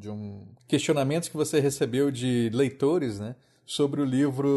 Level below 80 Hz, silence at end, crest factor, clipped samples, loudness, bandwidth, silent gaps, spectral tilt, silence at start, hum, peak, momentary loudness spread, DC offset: -66 dBFS; 0 s; 14 dB; under 0.1%; -26 LUFS; 12.5 kHz; none; -5.5 dB/octave; 0 s; none; -12 dBFS; 13 LU; under 0.1%